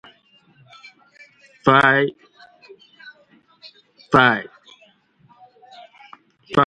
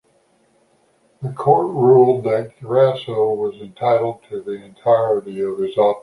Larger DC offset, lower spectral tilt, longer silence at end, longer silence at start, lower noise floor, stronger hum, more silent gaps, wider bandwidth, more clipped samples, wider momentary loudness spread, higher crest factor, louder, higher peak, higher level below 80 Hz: neither; second, -6 dB/octave vs -8.5 dB/octave; about the same, 0 s vs 0.05 s; first, 1.65 s vs 1.2 s; about the same, -56 dBFS vs -59 dBFS; neither; neither; about the same, 11 kHz vs 11 kHz; neither; second, 12 LU vs 15 LU; first, 22 dB vs 16 dB; about the same, -17 LUFS vs -18 LUFS; about the same, 0 dBFS vs -2 dBFS; first, -56 dBFS vs -64 dBFS